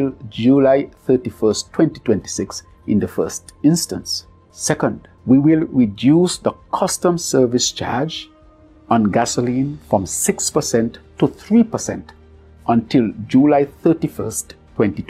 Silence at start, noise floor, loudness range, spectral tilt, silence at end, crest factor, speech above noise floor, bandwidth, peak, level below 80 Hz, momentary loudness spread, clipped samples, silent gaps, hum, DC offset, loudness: 0 s; -47 dBFS; 3 LU; -5 dB/octave; 0.05 s; 16 dB; 30 dB; 15 kHz; 0 dBFS; -48 dBFS; 11 LU; under 0.1%; none; none; under 0.1%; -18 LUFS